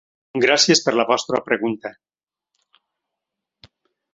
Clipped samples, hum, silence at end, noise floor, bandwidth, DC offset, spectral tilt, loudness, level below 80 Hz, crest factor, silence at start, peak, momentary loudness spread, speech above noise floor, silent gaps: under 0.1%; none; 2.25 s; -83 dBFS; 8 kHz; under 0.1%; -2.5 dB/octave; -18 LUFS; -66 dBFS; 20 dB; 0.35 s; -2 dBFS; 16 LU; 64 dB; none